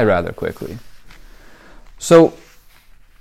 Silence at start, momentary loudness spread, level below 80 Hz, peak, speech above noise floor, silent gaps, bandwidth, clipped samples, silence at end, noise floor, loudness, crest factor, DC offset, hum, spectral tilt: 0 s; 21 LU; -46 dBFS; 0 dBFS; 31 dB; none; 15 kHz; under 0.1%; 0.9 s; -45 dBFS; -15 LUFS; 18 dB; under 0.1%; none; -6 dB/octave